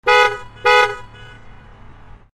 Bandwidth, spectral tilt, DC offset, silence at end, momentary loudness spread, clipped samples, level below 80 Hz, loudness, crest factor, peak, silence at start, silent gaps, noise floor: 14 kHz; -2 dB/octave; under 0.1%; 0.4 s; 8 LU; under 0.1%; -44 dBFS; -15 LUFS; 18 dB; 0 dBFS; 0.05 s; none; -40 dBFS